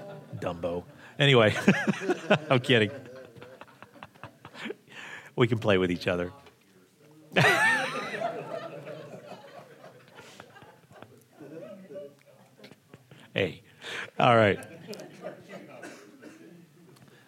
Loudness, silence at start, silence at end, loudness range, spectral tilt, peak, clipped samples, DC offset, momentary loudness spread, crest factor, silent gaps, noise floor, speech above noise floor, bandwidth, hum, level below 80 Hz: -26 LUFS; 0 s; 0.8 s; 22 LU; -5.5 dB/octave; -4 dBFS; under 0.1%; under 0.1%; 27 LU; 26 dB; none; -60 dBFS; 36 dB; 16 kHz; none; -72 dBFS